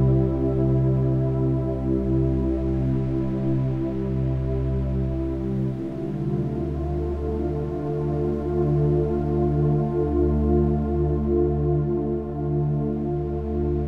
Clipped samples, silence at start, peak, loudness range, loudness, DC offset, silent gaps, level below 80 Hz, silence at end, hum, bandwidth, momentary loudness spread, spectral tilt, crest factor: under 0.1%; 0 s; -10 dBFS; 4 LU; -24 LUFS; under 0.1%; none; -30 dBFS; 0 s; none; 4.3 kHz; 6 LU; -11.5 dB/octave; 12 dB